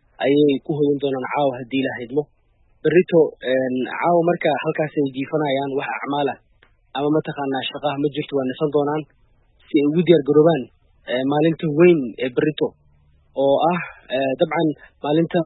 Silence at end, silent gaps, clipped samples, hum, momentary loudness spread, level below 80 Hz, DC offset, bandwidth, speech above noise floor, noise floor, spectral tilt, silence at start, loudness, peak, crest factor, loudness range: 0 s; none; under 0.1%; none; 10 LU; -60 dBFS; under 0.1%; 4.1 kHz; 39 dB; -58 dBFS; -11.5 dB/octave; 0.2 s; -20 LUFS; 0 dBFS; 20 dB; 5 LU